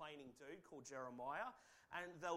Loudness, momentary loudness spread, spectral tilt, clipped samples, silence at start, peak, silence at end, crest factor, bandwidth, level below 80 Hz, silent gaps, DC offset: -52 LUFS; 10 LU; -3.5 dB/octave; under 0.1%; 0 s; -32 dBFS; 0 s; 20 dB; 15.5 kHz; -84 dBFS; none; under 0.1%